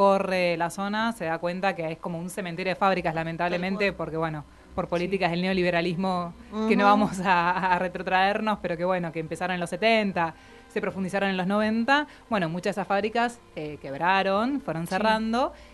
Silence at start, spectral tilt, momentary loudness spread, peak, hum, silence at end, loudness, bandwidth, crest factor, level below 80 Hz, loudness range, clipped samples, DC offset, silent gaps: 0 s; -5.5 dB/octave; 9 LU; -6 dBFS; none; 0 s; -26 LUFS; 12 kHz; 20 dB; -54 dBFS; 4 LU; under 0.1%; under 0.1%; none